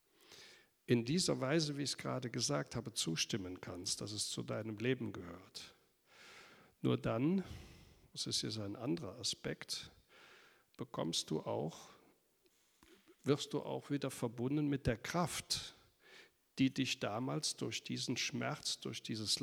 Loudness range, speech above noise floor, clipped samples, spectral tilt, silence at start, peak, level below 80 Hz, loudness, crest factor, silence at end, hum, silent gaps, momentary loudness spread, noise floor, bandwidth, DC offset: 5 LU; 36 dB; under 0.1%; -4 dB/octave; 0.3 s; -18 dBFS; -68 dBFS; -39 LUFS; 22 dB; 0 s; none; none; 16 LU; -75 dBFS; over 20 kHz; under 0.1%